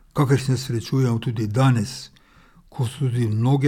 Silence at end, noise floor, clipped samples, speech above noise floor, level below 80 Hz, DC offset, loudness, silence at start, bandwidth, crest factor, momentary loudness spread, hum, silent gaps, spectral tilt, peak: 0 s; -52 dBFS; under 0.1%; 32 dB; -52 dBFS; under 0.1%; -22 LUFS; 0.15 s; 14 kHz; 14 dB; 12 LU; none; none; -7 dB/octave; -6 dBFS